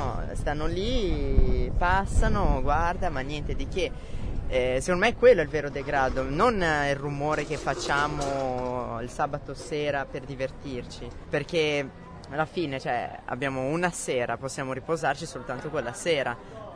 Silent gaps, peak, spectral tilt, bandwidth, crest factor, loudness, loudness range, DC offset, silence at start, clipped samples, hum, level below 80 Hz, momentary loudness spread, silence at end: none; -6 dBFS; -5 dB/octave; 11 kHz; 20 dB; -28 LUFS; 6 LU; under 0.1%; 0 s; under 0.1%; none; -34 dBFS; 10 LU; 0 s